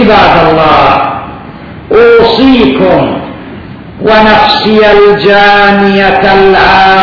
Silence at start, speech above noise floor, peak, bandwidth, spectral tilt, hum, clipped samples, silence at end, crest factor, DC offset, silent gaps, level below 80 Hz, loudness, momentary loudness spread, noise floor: 0 s; 21 dB; 0 dBFS; 5.4 kHz; -6.5 dB/octave; none; 10%; 0 s; 4 dB; under 0.1%; none; -28 dBFS; -4 LUFS; 17 LU; -24 dBFS